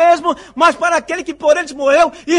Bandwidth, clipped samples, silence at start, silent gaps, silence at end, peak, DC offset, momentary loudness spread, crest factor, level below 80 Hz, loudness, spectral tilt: 11 kHz; under 0.1%; 0 s; none; 0 s; 0 dBFS; under 0.1%; 6 LU; 12 dB; -50 dBFS; -14 LUFS; -2.5 dB/octave